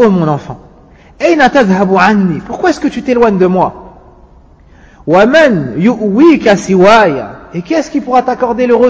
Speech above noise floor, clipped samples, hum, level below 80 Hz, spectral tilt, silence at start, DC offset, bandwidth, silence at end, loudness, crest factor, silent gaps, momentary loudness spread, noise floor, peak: 31 dB; 0.7%; none; -40 dBFS; -6.5 dB/octave; 0 s; under 0.1%; 8 kHz; 0 s; -9 LUFS; 10 dB; none; 9 LU; -40 dBFS; 0 dBFS